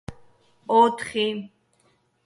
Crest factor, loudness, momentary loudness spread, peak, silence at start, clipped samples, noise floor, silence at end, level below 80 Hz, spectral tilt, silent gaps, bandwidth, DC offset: 20 dB; -22 LUFS; 23 LU; -6 dBFS; 0.1 s; under 0.1%; -65 dBFS; 0.8 s; -58 dBFS; -4.5 dB/octave; none; 11.5 kHz; under 0.1%